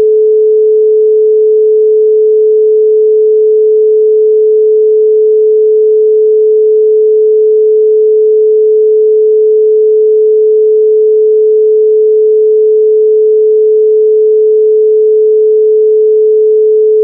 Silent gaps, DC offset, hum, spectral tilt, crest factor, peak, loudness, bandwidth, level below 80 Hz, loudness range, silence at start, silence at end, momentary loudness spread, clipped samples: none; under 0.1%; none; -11.5 dB/octave; 4 dB; -2 dBFS; -7 LUFS; 0.6 kHz; -86 dBFS; 0 LU; 0 s; 0 s; 0 LU; under 0.1%